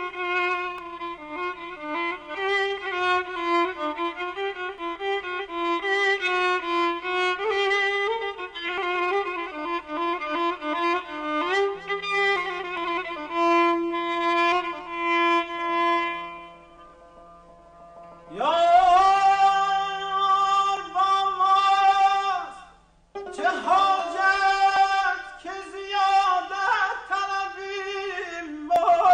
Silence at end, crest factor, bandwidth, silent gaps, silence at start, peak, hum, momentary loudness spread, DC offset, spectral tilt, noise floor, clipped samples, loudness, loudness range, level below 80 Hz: 0 s; 16 dB; 9.8 kHz; none; 0 s; -8 dBFS; none; 13 LU; under 0.1%; -2.5 dB/octave; -54 dBFS; under 0.1%; -23 LUFS; 6 LU; -58 dBFS